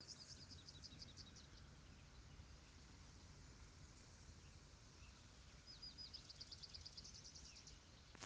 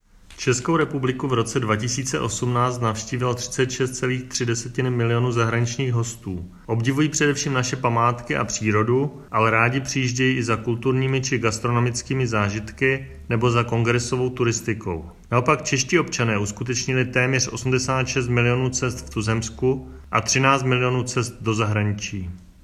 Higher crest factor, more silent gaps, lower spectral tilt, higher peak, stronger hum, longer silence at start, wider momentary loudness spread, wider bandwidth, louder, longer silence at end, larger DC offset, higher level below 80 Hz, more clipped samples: first, 26 dB vs 20 dB; neither; second, -2.5 dB/octave vs -5 dB/octave; second, -36 dBFS vs -2 dBFS; neither; second, 0 s vs 0.3 s; first, 9 LU vs 6 LU; second, 9.6 kHz vs 13 kHz; second, -60 LUFS vs -22 LUFS; second, 0 s vs 0.2 s; neither; second, -68 dBFS vs -46 dBFS; neither